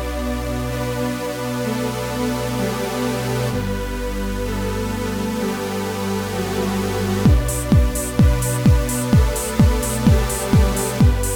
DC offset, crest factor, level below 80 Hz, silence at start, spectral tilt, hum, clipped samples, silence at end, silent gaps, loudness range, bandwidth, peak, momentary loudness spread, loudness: under 0.1%; 18 dB; -24 dBFS; 0 s; -5.5 dB/octave; none; under 0.1%; 0 s; none; 6 LU; over 20 kHz; 0 dBFS; 7 LU; -20 LUFS